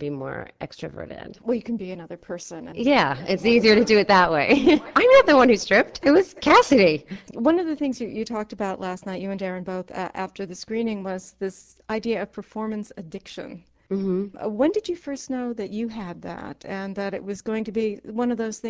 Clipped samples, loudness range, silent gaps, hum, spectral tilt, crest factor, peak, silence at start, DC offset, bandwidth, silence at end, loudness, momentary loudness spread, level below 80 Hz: under 0.1%; 13 LU; none; none; -5 dB/octave; 18 dB; -4 dBFS; 0 s; under 0.1%; 8 kHz; 0 s; -22 LUFS; 19 LU; -54 dBFS